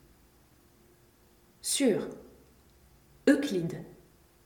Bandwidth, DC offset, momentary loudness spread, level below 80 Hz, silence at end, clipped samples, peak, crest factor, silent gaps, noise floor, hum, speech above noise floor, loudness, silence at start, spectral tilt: 19 kHz; under 0.1%; 19 LU; -66 dBFS; 0.5 s; under 0.1%; -10 dBFS; 24 dB; none; -62 dBFS; none; 34 dB; -29 LUFS; 1.65 s; -4 dB/octave